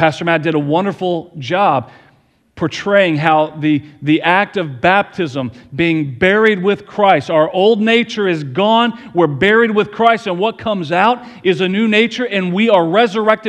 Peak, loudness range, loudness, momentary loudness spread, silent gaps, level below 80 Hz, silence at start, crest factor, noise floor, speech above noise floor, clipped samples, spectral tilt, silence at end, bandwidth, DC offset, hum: 0 dBFS; 3 LU; -14 LUFS; 8 LU; none; -52 dBFS; 0 s; 14 dB; -54 dBFS; 40 dB; under 0.1%; -6.5 dB/octave; 0 s; 9.6 kHz; under 0.1%; none